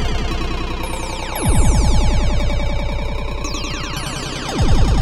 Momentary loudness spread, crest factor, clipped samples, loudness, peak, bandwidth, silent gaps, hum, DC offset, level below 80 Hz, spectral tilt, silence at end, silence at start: 8 LU; 14 dB; under 0.1%; -21 LUFS; -2 dBFS; 12.5 kHz; none; none; under 0.1%; -18 dBFS; -5 dB/octave; 0 s; 0 s